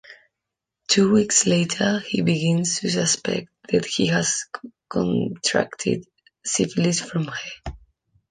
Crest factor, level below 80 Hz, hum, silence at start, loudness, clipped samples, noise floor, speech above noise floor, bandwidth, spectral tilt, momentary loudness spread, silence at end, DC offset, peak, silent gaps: 20 dB; -52 dBFS; none; 0.1 s; -22 LUFS; under 0.1%; -84 dBFS; 62 dB; 10 kHz; -4 dB/octave; 14 LU; 0.55 s; under 0.1%; -2 dBFS; none